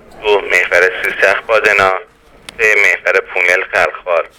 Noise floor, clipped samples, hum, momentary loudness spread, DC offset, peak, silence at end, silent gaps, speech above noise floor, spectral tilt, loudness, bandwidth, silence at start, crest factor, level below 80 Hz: -38 dBFS; 0.1%; none; 5 LU; under 0.1%; 0 dBFS; 0.1 s; none; 25 dB; -2 dB/octave; -11 LUFS; over 20 kHz; 0.15 s; 14 dB; -48 dBFS